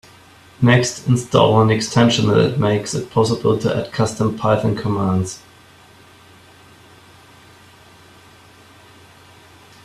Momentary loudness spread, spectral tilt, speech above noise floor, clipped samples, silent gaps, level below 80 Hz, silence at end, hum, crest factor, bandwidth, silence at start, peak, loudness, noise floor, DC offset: 7 LU; -5.5 dB/octave; 30 dB; under 0.1%; none; -52 dBFS; 4.45 s; none; 18 dB; 13 kHz; 0.6 s; 0 dBFS; -17 LUFS; -47 dBFS; under 0.1%